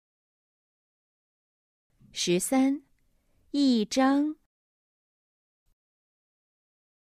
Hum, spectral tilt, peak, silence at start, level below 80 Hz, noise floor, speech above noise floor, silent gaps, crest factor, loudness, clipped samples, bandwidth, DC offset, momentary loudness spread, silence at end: none; -4 dB/octave; -12 dBFS; 2.15 s; -70 dBFS; -68 dBFS; 43 dB; none; 20 dB; -26 LUFS; under 0.1%; 14.5 kHz; under 0.1%; 12 LU; 2.75 s